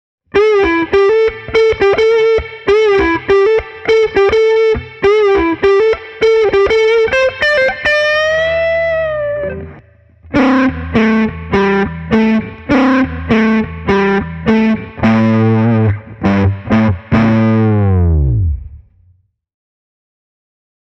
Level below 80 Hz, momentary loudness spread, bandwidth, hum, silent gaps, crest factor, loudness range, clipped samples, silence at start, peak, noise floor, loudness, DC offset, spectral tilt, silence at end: -30 dBFS; 5 LU; 8 kHz; none; none; 12 dB; 3 LU; under 0.1%; 0.35 s; 0 dBFS; -53 dBFS; -12 LUFS; under 0.1%; -7.5 dB/octave; 2.1 s